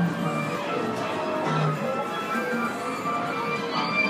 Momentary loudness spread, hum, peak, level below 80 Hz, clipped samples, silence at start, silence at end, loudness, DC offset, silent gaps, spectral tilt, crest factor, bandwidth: 3 LU; none; -14 dBFS; -68 dBFS; under 0.1%; 0 s; 0 s; -27 LUFS; under 0.1%; none; -5.5 dB/octave; 14 dB; 15.5 kHz